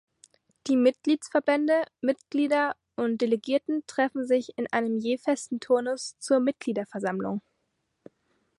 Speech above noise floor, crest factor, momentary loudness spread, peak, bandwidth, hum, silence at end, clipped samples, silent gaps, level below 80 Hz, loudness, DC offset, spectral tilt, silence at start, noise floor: 51 dB; 18 dB; 8 LU; -10 dBFS; 11.5 kHz; none; 1.2 s; under 0.1%; none; -76 dBFS; -27 LUFS; under 0.1%; -5 dB/octave; 0.65 s; -77 dBFS